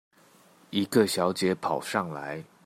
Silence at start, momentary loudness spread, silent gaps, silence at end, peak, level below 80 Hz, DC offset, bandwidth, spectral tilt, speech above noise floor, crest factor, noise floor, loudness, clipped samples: 0.7 s; 11 LU; none; 0.25 s; -8 dBFS; -72 dBFS; under 0.1%; 16 kHz; -4.5 dB/octave; 31 dB; 20 dB; -59 dBFS; -28 LUFS; under 0.1%